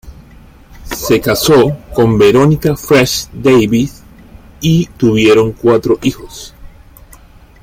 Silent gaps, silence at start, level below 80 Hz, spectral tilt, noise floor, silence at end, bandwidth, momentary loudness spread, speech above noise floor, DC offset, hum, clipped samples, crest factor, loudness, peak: none; 0.05 s; -36 dBFS; -5.5 dB/octave; -39 dBFS; 0.95 s; 16.5 kHz; 13 LU; 29 dB; under 0.1%; none; under 0.1%; 12 dB; -11 LUFS; 0 dBFS